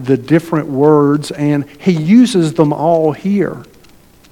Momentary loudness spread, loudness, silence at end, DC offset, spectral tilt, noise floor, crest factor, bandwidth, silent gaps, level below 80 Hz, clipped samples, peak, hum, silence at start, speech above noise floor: 7 LU; -13 LUFS; 0.7 s; under 0.1%; -7.5 dB/octave; -44 dBFS; 12 dB; 17 kHz; none; -52 dBFS; under 0.1%; 0 dBFS; none; 0 s; 32 dB